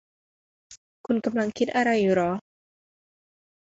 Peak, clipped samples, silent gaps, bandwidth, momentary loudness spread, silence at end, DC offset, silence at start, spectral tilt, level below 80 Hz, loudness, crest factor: -10 dBFS; under 0.1%; 0.77-1.04 s; 8 kHz; 9 LU; 1.3 s; under 0.1%; 0.7 s; -6 dB/octave; -66 dBFS; -25 LUFS; 18 dB